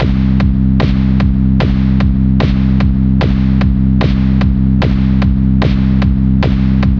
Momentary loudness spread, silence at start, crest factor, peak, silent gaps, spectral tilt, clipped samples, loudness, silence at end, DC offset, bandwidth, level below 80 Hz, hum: 0 LU; 0 s; 10 dB; 0 dBFS; none; -9.5 dB/octave; under 0.1%; -12 LUFS; 0 s; under 0.1%; 6 kHz; -16 dBFS; none